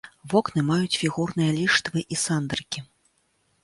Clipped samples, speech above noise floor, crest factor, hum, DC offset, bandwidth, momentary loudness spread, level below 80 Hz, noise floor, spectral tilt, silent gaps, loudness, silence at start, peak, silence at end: under 0.1%; 44 dB; 20 dB; none; under 0.1%; 11.5 kHz; 8 LU; -58 dBFS; -69 dBFS; -4.5 dB/octave; none; -24 LUFS; 0.05 s; -6 dBFS; 0.8 s